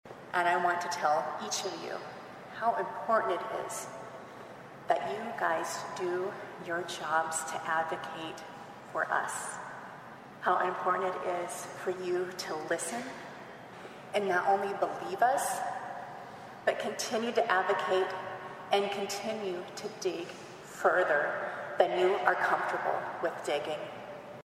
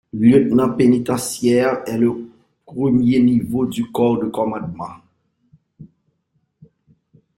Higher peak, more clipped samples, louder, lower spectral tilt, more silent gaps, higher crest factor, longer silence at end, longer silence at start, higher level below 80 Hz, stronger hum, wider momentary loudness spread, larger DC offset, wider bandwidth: second, -10 dBFS vs -2 dBFS; neither; second, -32 LUFS vs -17 LUFS; second, -3 dB/octave vs -6.5 dB/octave; neither; first, 24 dB vs 16 dB; second, 0.05 s vs 1.5 s; about the same, 0.05 s vs 0.15 s; second, -76 dBFS vs -54 dBFS; neither; first, 17 LU vs 14 LU; neither; about the same, 15.5 kHz vs 16 kHz